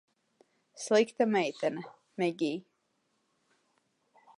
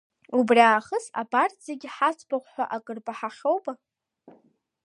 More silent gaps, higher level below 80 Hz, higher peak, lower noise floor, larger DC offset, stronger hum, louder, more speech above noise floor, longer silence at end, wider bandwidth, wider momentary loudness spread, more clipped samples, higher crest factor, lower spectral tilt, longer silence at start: neither; second, -88 dBFS vs -80 dBFS; second, -14 dBFS vs -4 dBFS; first, -77 dBFS vs -63 dBFS; neither; neither; second, -30 LUFS vs -25 LUFS; first, 47 dB vs 39 dB; first, 1.8 s vs 1.1 s; about the same, 11.5 kHz vs 11 kHz; about the same, 16 LU vs 18 LU; neither; about the same, 20 dB vs 22 dB; about the same, -4.5 dB/octave vs -4 dB/octave; first, 0.75 s vs 0.3 s